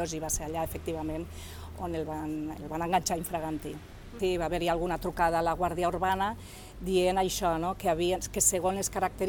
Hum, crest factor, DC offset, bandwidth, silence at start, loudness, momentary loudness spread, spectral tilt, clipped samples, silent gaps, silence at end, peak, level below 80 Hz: none; 20 dB; under 0.1%; 19 kHz; 0 s; -30 LUFS; 13 LU; -4 dB/octave; under 0.1%; none; 0 s; -10 dBFS; -46 dBFS